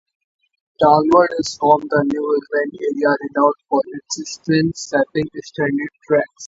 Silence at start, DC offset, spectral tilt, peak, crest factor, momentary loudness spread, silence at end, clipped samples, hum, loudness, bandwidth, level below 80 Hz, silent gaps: 0.8 s; under 0.1%; -5 dB/octave; 0 dBFS; 18 dB; 10 LU; 0 s; under 0.1%; none; -18 LUFS; 8 kHz; -54 dBFS; none